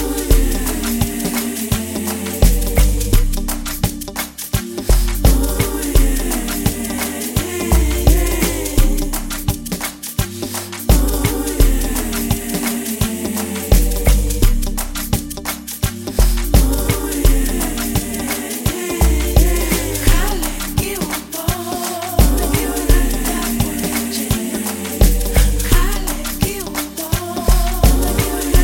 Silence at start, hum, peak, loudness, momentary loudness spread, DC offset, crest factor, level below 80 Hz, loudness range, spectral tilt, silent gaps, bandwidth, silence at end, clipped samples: 0 s; none; 0 dBFS; -18 LUFS; 7 LU; under 0.1%; 16 dB; -18 dBFS; 1 LU; -4.5 dB/octave; none; 17 kHz; 0 s; under 0.1%